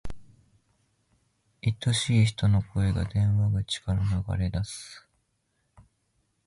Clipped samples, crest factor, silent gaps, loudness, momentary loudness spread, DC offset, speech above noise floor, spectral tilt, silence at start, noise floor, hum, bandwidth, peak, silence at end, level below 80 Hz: under 0.1%; 18 dB; none; -27 LUFS; 11 LU; under 0.1%; 49 dB; -5.5 dB/octave; 0.05 s; -74 dBFS; none; 11.5 kHz; -10 dBFS; 1.5 s; -42 dBFS